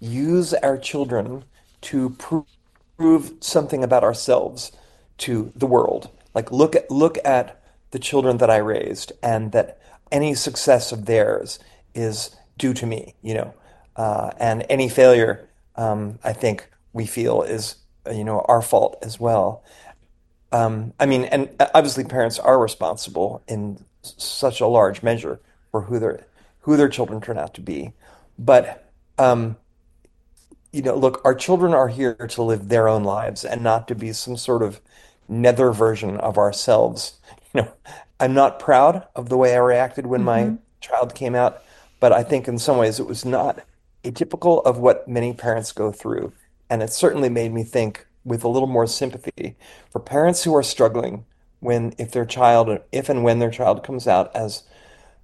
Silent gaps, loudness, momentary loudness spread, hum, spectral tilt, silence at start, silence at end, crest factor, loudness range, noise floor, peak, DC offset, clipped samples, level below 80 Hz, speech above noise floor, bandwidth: none; -20 LUFS; 14 LU; none; -5.5 dB/octave; 0 s; 0.65 s; 20 dB; 4 LU; -57 dBFS; 0 dBFS; under 0.1%; under 0.1%; -54 dBFS; 38 dB; 12.5 kHz